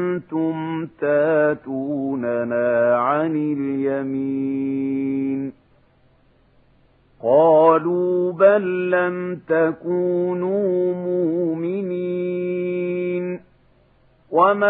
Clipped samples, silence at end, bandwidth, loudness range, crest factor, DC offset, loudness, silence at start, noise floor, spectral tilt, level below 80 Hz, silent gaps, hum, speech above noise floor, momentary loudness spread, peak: under 0.1%; 0 s; 4 kHz; 7 LU; 18 dB; under 0.1%; -20 LUFS; 0 s; -57 dBFS; -11.5 dB/octave; -66 dBFS; none; none; 38 dB; 9 LU; -2 dBFS